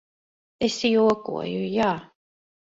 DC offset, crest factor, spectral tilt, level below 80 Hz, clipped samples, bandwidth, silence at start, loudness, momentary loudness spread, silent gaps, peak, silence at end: under 0.1%; 16 dB; -5 dB/octave; -60 dBFS; under 0.1%; 8 kHz; 0.6 s; -24 LUFS; 9 LU; none; -8 dBFS; 0.65 s